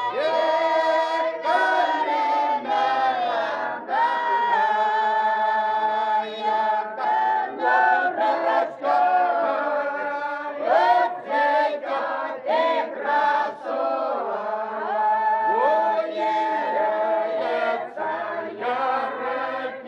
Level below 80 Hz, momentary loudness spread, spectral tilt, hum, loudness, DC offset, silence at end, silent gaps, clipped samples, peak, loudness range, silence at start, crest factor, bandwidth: -78 dBFS; 7 LU; -3.5 dB/octave; none; -22 LUFS; under 0.1%; 0 s; none; under 0.1%; -8 dBFS; 3 LU; 0 s; 14 dB; 8.8 kHz